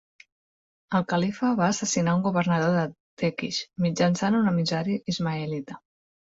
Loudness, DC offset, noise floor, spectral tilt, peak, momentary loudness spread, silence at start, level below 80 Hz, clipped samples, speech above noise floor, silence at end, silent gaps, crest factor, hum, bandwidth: -25 LUFS; under 0.1%; under -90 dBFS; -5.5 dB/octave; -10 dBFS; 8 LU; 0.9 s; -62 dBFS; under 0.1%; over 65 dB; 0.55 s; 3.00-3.17 s; 16 dB; none; 8 kHz